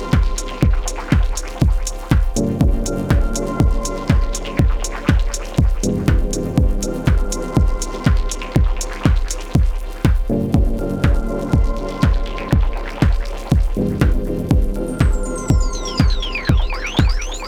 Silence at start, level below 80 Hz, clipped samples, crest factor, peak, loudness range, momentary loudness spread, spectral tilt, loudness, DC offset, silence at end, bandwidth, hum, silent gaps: 0 s; -18 dBFS; under 0.1%; 16 dB; 0 dBFS; 0 LU; 4 LU; -6 dB/octave; -19 LUFS; under 0.1%; 0 s; 14.5 kHz; none; none